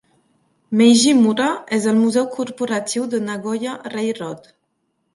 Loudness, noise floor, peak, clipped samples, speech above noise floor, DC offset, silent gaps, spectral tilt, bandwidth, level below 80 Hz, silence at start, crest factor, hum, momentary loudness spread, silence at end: -18 LUFS; -70 dBFS; -2 dBFS; under 0.1%; 52 dB; under 0.1%; none; -4 dB/octave; 11.5 kHz; -68 dBFS; 0.7 s; 16 dB; none; 13 LU; 0.75 s